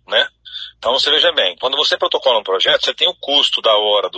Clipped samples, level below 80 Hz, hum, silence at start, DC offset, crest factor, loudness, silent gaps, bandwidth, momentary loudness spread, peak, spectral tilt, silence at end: under 0.1%; -60 dBFS; none; 0.1 s; under 0.1%; 16 dB; -14 LUFS; none; 9.2 kHz; 7 LU; 0 dBFS; -0.5 dB/octave; 0 s